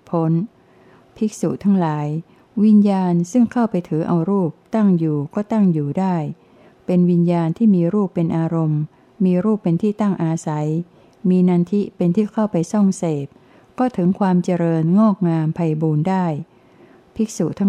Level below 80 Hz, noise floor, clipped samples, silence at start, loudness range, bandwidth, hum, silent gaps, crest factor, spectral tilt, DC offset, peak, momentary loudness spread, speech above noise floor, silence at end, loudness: -62 dBFS; -50 dBFS; under 0.1%; 0.1 s; 2 LU; 10.5 kHz; none; none; 14 dB; -8.5 dB/octave; under 0.1%; -6 dBFS; 9 LU; 32 dB; 0 s; -19 LUFS